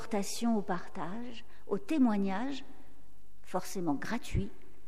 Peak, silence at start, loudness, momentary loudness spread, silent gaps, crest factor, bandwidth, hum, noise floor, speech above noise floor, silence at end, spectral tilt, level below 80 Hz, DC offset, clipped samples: -18 dBFS; 0 s; -35 LUFS; 15 LU; none; 16 dB; 15.5 kHz; none; -63 dBFS; 29 dB; 0.3 s; -5.5 dB/octave; -52 dBFS; 2%; under 0.1%